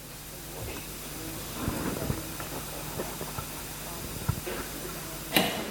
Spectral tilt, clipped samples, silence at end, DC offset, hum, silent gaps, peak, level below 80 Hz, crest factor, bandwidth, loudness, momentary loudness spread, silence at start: -3.5 dB/octave; under 0.1%; 0 s; under 0.1%; none; none; -6 dBFS; -46 dBFS; 30 dB; 17.5 kHz; -33 LUFS; 10 LU; 0 s